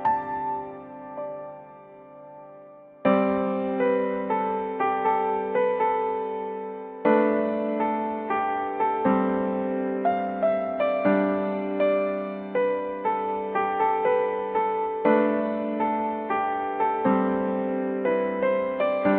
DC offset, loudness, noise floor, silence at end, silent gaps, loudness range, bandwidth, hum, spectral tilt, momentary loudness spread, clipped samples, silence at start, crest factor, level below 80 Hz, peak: under 0.1%; -25 LUFS; -47 dBFS; 0 s; none; 2 LU; 4.4 kHz; none; -10.5 dB/octave; 9 LU; under 0.1%; 0 s; 18 dB; -64 dBFS; -8 dBFS